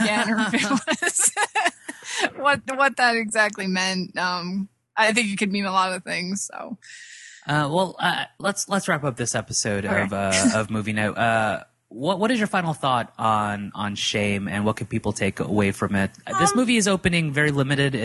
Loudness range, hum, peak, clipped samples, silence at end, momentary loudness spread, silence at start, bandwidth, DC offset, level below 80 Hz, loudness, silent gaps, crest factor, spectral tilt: 3 LU; none; -6 dBFS; under 0.1%; 0 s; 9 LU; 0 s; 12.5 kHz; under 0.1%; -52 dBFS; -22 LUFS; none; 18 dB; -3.5 dB/octave